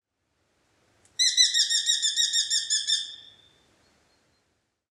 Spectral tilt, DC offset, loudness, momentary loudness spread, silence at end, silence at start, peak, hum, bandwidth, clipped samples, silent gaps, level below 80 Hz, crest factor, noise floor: 5.5 dB/octave; under 0.1%; -22 LUFS; 8 LU; 1.7 s; 1.2 s; -8 dBFS; none; 15 kHz; under 0.1%; none; -78 dBFS; 20 dB; -74 dBFS